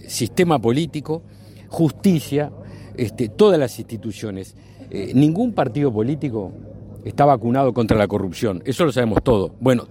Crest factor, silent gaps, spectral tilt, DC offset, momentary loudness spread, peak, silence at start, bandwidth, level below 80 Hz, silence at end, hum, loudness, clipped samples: 18 dB; none; -6.5 dB/octave; under 0.1%; 15 LU; -2 dBFS; 0.05 s; 16.5 kHz; -44 dBFS; 0.05 s; none; -20 LUFS; under 0.1%